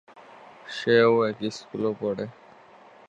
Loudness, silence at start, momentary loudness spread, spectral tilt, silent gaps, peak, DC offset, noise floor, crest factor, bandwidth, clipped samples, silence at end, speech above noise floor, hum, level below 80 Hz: -24 LUFS; 0.15 s; 18 LU; -6 dB/octave; none; -6 dBFS; under 0.1%; -51 dBFS; 20 dB; 8.2 kHz; under 0.1%; 0.8 s; 28 dB; none; -70 dBFS